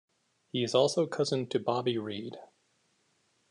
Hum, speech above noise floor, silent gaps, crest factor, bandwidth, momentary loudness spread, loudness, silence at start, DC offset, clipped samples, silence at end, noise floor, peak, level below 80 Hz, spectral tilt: none; 43 dB; none; 20 dB; 10.5 kHz; 14 LU; -30 LUFS; 0.55 s; under 0.1%; under 0.1%; 1.05 s; -73 dBFS; -12 dBFS; -80 dBFS; -5 dB/octave